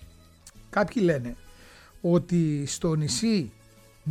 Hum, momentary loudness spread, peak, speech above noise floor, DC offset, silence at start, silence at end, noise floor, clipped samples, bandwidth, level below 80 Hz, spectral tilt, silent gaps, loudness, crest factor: none; 14 LU; -12 dBFS; 27 dB; under 0.1%; 0 s; 0 s; -52 dBFS; under 0.1%; 14 kHz; -52 dBFS; -5.5 dB/octave; none; -26 LUFS; 16 dB